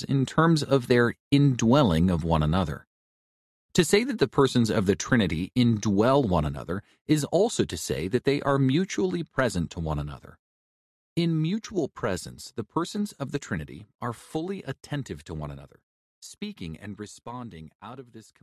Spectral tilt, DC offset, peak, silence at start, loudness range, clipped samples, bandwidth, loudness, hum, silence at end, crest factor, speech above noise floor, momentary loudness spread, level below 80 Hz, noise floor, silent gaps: -6 dB/octave; under 0.1%; -8 dBFS; 0 s; 13 LU; under 0.1%; 14 kHz; -26 LUFS; none; 0.2 s; 18 dB; over 64 dB; 17 LU; -44 dBFS; under -90 dBFS; 1.20-1.31 s, 2.87-3.69 s, 7.01-7.05 s, 10.39-11.16 s, 13.95-13.99 s, 15.83-16.22 s, 17.75-17.79 s